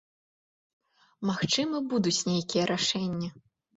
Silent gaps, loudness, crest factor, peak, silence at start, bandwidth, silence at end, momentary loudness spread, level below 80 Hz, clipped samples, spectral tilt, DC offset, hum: none; -28 LUFS; 18 dB; -14 dBFS; 1.2 s; 8 kHz; 0.45 s; 8 LU; -66 dBFS; under 0.1%; -4 dB/octave; under 0.1%; none